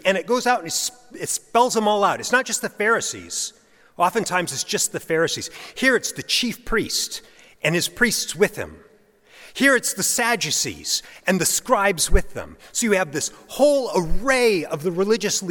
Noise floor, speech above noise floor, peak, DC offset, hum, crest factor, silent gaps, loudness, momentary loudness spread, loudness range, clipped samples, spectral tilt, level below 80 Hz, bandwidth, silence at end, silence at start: -54 dBFS; 33 dB; -2 dBFS; under 0.1%; none; 20 dB; none; -21 LUFS; 9 LU; 2 LU; under 0.1%; -2.5 dB/octave; -36 dBFS; 17.5 kHz; 0 s; 0.05 s